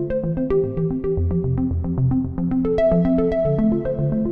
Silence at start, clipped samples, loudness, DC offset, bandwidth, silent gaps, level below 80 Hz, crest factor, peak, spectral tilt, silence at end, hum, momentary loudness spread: 0 s; under 0.1%; -21 LUFS; under 0.1%; 4.9 kHz; none; -34 dBFS; 12 dB; -8 dBFS; -11.5 dB/octave; 0 s; none; 5 LU